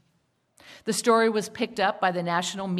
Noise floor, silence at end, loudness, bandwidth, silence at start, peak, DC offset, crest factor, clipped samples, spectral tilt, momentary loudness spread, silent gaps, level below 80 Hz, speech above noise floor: -70 dBFS; 0 s; -25 LUFS; 15 kHz; 0.65 s; -8 dBFS; under 0.1%; 18 dB; under 0.1%; -4 dB/octave; 9 LU; none; -70 dBFS; 45 dB